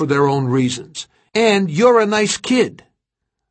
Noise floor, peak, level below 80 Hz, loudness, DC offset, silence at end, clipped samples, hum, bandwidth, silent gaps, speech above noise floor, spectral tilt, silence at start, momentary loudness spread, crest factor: -78 dBFS; -2 dBFS; -58 dBFS; -16 LUFS; under 0.1%; 0.8 s; under 0.1%; none; 8.8 kHz; none; 62 dB; -5 dB/octave; 0 s; 12 LU; 16 dB